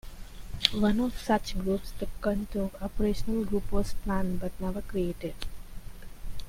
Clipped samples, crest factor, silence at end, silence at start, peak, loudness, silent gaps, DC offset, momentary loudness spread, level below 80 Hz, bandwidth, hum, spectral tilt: under 0.1%; 28 dB; 0 s; 0.05 s; 0 dBFS; -31 LUFS; none; under 0.1%; 21 LU; -38 dBFS; 16.5 kHz; none; -5.5 dB/octave